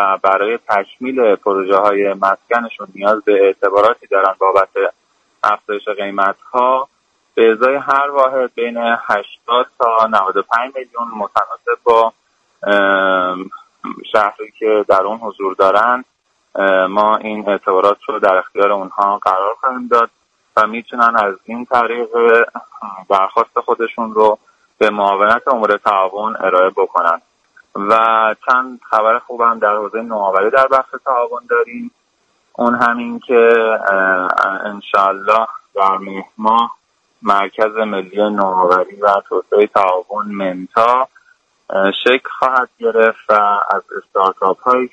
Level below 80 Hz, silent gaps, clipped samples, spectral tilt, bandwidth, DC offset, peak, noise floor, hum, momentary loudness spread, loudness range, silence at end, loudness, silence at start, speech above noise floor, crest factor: -62 dBFS; none; under 0.1%; -5.5 dB/octave; 9 kHz; under 0.1%; 0 dBFS; -61 dBFS; none; 9 LU; 2 LU; 0.05 s; -15 LUFS; 0 s; 46 dB; 14 dB